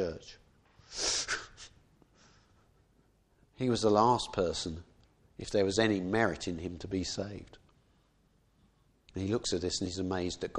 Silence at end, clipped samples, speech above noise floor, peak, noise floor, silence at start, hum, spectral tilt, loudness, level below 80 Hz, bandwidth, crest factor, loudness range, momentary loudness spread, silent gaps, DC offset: 0 s; under 0.1%; 37 dB; -10 dBFS; -69 dBFS; 0 s; none; -4 dB/octave; -32 LUFS; -56 dBFS; 11.5 kHz; 24 dB; 8 LU; 19 LU; none; under 0.1%